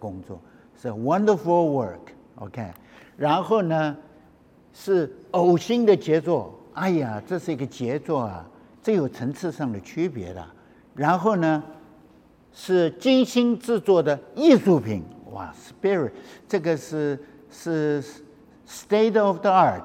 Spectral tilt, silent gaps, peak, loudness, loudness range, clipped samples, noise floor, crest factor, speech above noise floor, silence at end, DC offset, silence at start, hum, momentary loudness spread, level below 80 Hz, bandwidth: -6.5 dB/octave; none; -4 dBFS; -23 LUFS; 6 LU; under 0.1%; -54 dBFS; 20 dB; 31 dB; 0 s; under 0.1%; 0 s; none; 19 LU; -66 dBFS; 15.5 kHz